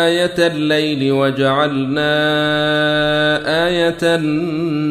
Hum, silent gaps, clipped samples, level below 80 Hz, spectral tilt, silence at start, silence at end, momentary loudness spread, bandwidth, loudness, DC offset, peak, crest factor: none; none; under 0.1%; -46 dBFS; -5.5 dB/octave; 0 s; 0 s; 3 LU; 14 kHz; -15 LUFS; under 0.1%; -2 dBFS; 14 dB